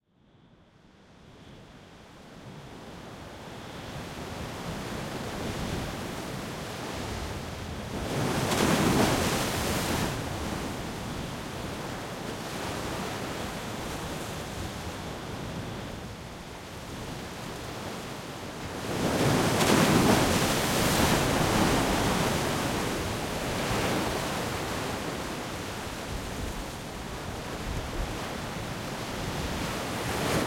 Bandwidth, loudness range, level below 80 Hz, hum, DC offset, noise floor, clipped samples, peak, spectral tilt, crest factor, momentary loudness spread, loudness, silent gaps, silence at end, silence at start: 16.5 kHz; 13 LU; -44 dBFS; none; under 0.1%; -60 dBFS; under 0.1%; -8 dBFS; -4.5 dB/octave; 22 dB; 16 LU; -30 LUFS; none; 0 s; 0.85 s